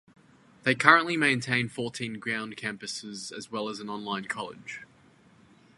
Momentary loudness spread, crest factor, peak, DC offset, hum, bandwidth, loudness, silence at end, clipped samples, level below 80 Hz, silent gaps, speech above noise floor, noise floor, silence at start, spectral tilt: 18 LU; 28 dB; -2 dBFS; under 0.1%; none; 11.5 kHz; -27 LUFS; 0.95 s; under 0.1%; -70 dBFS; none; 30 dB; -59 dBFS; 0.65 s; -4 dB/octave